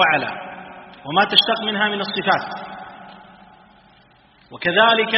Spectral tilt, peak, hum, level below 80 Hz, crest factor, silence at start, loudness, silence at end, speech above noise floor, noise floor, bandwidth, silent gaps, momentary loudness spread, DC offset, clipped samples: 0 dB/octave; 0 dBFS; none; -62 dBFS; 22 dB; 0 s; -18 LUFS; 0 s; 35 dB; -53 dBFS; 6 kHz; none; 23 LU; under 0.1%; under 0.1%